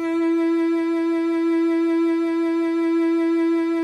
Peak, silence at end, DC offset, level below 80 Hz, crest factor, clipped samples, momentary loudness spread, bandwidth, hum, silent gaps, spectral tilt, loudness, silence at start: -14 dBFS; 0 s; under 0.1%; -72 dBFS; 6 dB; under 0.1%; 2 LU; 6.4 kHz; none; none; -5 dB/octave; -21 LUFS; 0 s